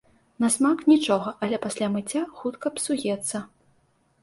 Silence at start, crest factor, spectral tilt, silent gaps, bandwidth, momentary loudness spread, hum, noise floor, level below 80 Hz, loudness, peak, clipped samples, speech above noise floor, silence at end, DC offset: 0.4 s; 18 dB; -4 dB/octave; none; 11.5 kHz; 10 LU; none; -65 dBFS; -66 dBFS; -25 LUFS; -8 dBFS; under 0.1%; 41 dB; 0.75 s; under 0.1%